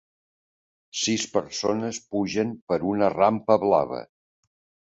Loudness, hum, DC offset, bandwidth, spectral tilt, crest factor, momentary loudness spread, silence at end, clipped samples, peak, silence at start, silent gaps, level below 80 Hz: -24 LUFS; none; under 0.1%; 8.2 kHz; -4.5 dB/octave; 20 dB; 9 LU; 0.85 s; under 0.1%; -6 dBFS; 0.95 s; 2.62-2.67 s; -60 dBFS